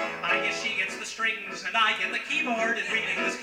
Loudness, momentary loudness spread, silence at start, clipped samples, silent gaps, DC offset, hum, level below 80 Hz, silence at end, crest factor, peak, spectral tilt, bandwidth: -26 LUFS; 5 LU; 0 s; under 0.1%; none; under 0.1%; none; -68 dBFS; 0 s; 16 dB; -12 dBFS; -1.5 dB/octave; 16.5 kHz